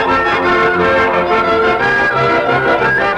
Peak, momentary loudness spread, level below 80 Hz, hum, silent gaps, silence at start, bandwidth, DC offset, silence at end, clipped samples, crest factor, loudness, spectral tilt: -2 dBFS; 1 LU; -38 dBFS; none; none; 0 s; 10.5 kHz; under 0.1%; 0 s; under 0.1%; 10 dB; -12 LUFS; -5.5 dB/octave